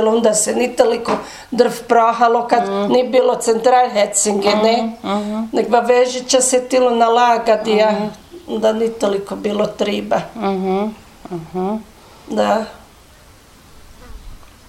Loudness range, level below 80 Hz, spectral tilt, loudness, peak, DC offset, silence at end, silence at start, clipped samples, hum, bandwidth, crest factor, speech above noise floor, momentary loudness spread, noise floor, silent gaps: 8 LU; -48 dBFS; -3.5 dB/octave; -16 LUFS; 0 dBFS; under 0.1%; 0.2 s; 0 s; under 0.1%; none; 15.5 kHz; 16 dB; 29 dB; 10 LU; -45 dBFS; none